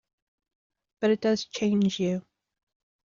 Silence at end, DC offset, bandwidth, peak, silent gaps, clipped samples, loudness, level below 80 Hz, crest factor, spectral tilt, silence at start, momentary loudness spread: 0.9 s; under 0.1%; 7.4 kHz; -14 dBFS; none; under 0.1%; -27 LUFS; -68 dBFS; 16 dB; -5.5 dB/octave; 1 s; 5 LU